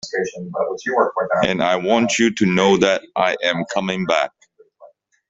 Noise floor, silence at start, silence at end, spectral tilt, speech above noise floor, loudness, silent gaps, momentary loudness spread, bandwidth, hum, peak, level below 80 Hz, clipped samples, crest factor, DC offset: -49 dBFS; 0.05 s; 0.45 s; -4.5 dB/octave; 31 dB; -19 LUFS; none; 9 LU; 8 kHz; none; -2 dBFS; -56 dBFS; under 0.1%; 16 dB; under 0.1%